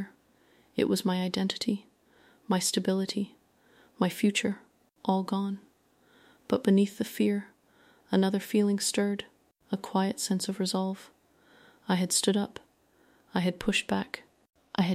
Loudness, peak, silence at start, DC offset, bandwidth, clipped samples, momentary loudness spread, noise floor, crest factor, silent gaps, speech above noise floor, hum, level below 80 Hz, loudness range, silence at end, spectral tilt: -29 LUFS; -10 dBFS; 0 s; under 0.1%; 15.5 kHz; under 0.1%; 12 LU; -65 dBFS; 20 dB; 14.49-14.53 s; 37 dB; none; -64 dBFS; 3 LU; 0 s; -4.5 dB/octave